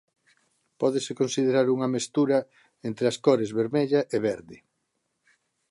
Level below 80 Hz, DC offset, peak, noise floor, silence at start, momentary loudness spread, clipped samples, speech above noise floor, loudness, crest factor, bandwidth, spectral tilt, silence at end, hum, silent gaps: -70 dBFS; under 0.1%; -8 dBFS; -77 dBFS; 0.8 s; 6 LU; under 0.1%; 52 dB; -25 LUFS; 20 dB; 11.5 kHz; -5.5 dB/octave; 1.15 s; none; none